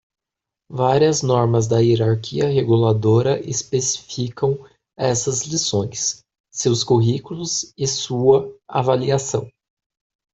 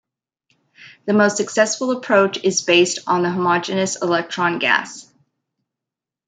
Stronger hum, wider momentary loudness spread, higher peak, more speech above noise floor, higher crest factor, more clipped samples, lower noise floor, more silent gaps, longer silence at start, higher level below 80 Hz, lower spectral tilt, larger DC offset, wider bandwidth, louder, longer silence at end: neither; about the same, 8 LU vs 6 LU; about the same, -2 dBFS vs -2 dBFS; about the same, 67 dB vs 68 dB; about the same, 18 dB vs 18 dB; neither; about the same, -86 dBFS vs -86 dBFS; first, 6.40-6.44 s vs none; about the same, 0.7 s vs 0.8 s; first, -54 dBFS vs -70 dBFS; first, -5 dB/octave vs -3.5 dB/octave; neither; second, 8.2 kHz vs 9.6 kHz; about the same, -19 LUFS vs -18 LUFS; second, 0.85 s vs 1.25 s